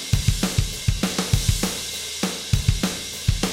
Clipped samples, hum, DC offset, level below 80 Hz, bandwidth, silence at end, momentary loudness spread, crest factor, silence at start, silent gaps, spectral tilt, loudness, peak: under 0.1%; none; under 0.1%; -30 dBFS; 17 kHz; 0 s; 4 LU; 18 dB; 0 s; none; -4 dB/octave; -23 LUFS; -4 dBFS